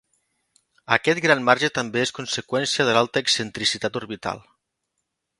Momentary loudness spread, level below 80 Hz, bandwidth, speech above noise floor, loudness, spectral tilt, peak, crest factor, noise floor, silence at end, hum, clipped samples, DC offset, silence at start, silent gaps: 11 LU; -62 dBFS; 11.5 kHz; 56 dB; -22 LUFS; -3 dB/octave; 0 dBFS; 24 dB; -79 dBFS; 1 s; none; under 0.1%; under 0.1%; 0.9 s; none